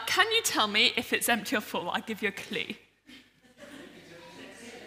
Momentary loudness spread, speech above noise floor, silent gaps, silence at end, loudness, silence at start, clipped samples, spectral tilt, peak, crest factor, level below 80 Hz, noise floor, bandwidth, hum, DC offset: 25 LU; 27 dB; none; 0 s; -27 LUFS; 0 s; under 0.1%; -1.5 dB/octave; -8 dBFS; 24 dB; -72 dBFS; -55 dBFS; 16 kHz; none; under 0.1%